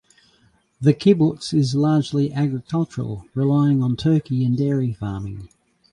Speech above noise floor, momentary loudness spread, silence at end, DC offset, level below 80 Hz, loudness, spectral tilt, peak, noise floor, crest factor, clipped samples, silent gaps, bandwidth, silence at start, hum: 40 dB; 11 LU; 0.45 s; under 0.1%; -50 dBFS; -20 LUFS; -8 dB/octave; -4 dBFS; -60 dBFS; 18 dB; under 0.1%; none; 10.5 kHz; 0.8 s; none